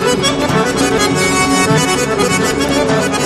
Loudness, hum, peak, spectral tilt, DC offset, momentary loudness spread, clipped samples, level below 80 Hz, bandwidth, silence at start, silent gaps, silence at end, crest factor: -13 LUFS; none; -2 dBFS; -4 dB/octave; under 0.1%; 2 LU; under 0.1%; -36 dBFS; 13.5 kHz; 0 s; none; 0 s; 12 dB